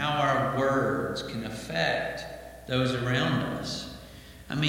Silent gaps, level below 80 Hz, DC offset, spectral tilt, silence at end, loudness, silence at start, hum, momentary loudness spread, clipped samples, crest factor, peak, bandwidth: none; -52 dBFS; under 0.1%; -5.5 dB/octave; 0 s; -28 LUFS; 0 s; none; 16 LU; under 0.1%; 18 dB; -10 dBFS; 16.5 kHz